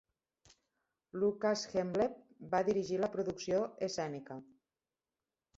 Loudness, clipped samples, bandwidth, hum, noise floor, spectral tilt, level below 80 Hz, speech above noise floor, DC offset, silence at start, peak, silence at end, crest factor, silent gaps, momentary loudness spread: -36 LUFS; under 0.1%; 8 kHz; none; under -90 dBFS; -5 dB/octave; -72 dBFS; over 55 dB; under 0.1%; 1.15 s; -18 dBFS; 1.15 s; 18 dB; none; 14 LU